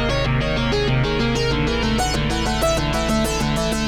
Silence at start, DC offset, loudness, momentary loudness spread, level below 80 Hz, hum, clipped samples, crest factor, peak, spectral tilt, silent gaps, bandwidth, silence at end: 0 s; 0.4%; -20 LUFS; 1 LU; -28 dBFS; none; under 0.1%; 14 dB; -4 dBFS; -5 dB/octave; none; 17.5 kHz; 0 s